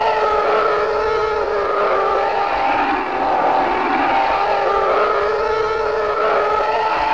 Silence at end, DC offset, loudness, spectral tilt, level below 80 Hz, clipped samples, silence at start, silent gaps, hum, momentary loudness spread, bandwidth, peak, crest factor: 0 s; 0.7%; -17 LUFS; -4.5 dB/octave; -44 dBFS; under 0.1%; 0 s; none; none; 3 LU; 8 kHz; -6 dBFS; 10 dB